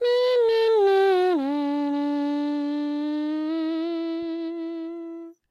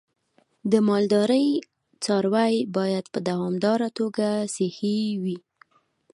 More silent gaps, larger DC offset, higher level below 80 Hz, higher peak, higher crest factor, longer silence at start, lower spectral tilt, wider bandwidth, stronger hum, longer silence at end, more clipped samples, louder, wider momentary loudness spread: neither; neither; about the same, -74 dBFS vs -72 dBFS; second, -12 dBFS vs -6 dBFS; second, 12 dB vs 18 dB; second, 0 s vs 0.65 s; second, -4 dB/octave vs -6 dB/octave; about the same, 12 kHz vs 11.5 kHz; neither; second, 0.2 s vs 0.75 s; neither; about the same, -24 LUFS vs -24 LUFS; first, 13 LU vs 9 LU